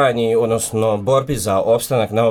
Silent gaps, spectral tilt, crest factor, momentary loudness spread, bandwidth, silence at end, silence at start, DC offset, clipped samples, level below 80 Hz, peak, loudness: none; -5 dB/octave; 14 dB; 2 LU; 18.5 kHz; 0 s; 0 s; under 0.1%; under 0.1%; -46 dBFS; -2 dBFS; -17 LUFS